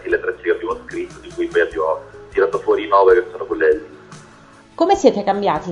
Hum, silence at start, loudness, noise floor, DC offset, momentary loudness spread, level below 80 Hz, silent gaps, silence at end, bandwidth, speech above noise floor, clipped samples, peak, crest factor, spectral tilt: none; 0 s; -18 LUFS; -45 dBFS; under 0.1%; 13 LU; -48 dBFS; none; 0 s; 10.5 kHz; 31 dB; under 0.1%; 0 dBFS; 18 dB; -5 dB/octave